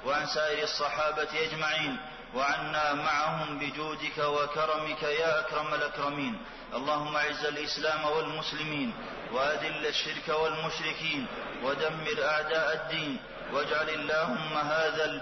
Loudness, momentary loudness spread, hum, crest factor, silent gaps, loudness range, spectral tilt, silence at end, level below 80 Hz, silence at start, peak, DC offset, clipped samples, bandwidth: -30 LUFS; 6 LU; none; 14 dB; none; 2 LU; -3.5 dB/octave; 0 s; -58 dBFS; 0 s; -18 dBFS; under 0.1%; under 0.1%; 6.4 kHz